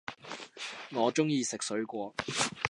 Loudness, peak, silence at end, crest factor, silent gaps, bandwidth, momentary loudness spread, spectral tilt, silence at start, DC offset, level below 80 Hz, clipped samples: -33 LUFS; -10 dBFS; 0 s; 24 dB; none; 11.5 kHz; 13 LU; -3.5 dB/octave; 0.1 s; under 0.1%; -68 dBFS; under 0.1%